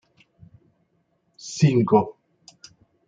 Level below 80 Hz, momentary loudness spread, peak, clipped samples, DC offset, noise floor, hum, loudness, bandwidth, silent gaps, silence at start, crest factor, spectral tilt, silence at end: -64 dBFS; 18 LU; -6 dBFS; under 0.1%; under 0.1%; -69 dBFS; none; -21 LUFS; 8.8 kHz; none; 1.45 s; 20 dB; -7 dB/octave; 0.95 s